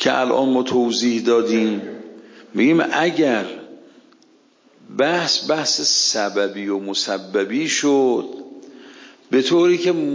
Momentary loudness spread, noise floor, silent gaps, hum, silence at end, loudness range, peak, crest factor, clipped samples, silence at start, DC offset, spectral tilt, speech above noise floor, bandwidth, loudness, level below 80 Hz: 13 LU; -55 dBFS; none; none; 0 s; 3 LU; -4 dBFS; 16 dB; under 0.1%; 0 s; under 0.1%; -3 dB/octave; 37 dB; 7.6 kHz; -18 LUFS; -72 dBFS